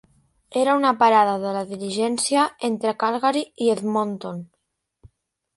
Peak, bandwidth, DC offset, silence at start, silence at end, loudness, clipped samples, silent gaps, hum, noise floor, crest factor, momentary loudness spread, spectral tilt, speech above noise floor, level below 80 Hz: -4 dBFS; 11.5 kHz; under 0.1%; 0.5 s; 1.1 s; -21 LUFS; under 0.1%; none; none; -75 dBFS; 18 dB; 12 LU; -4 dB/octave; 54 dB; -66 dBFS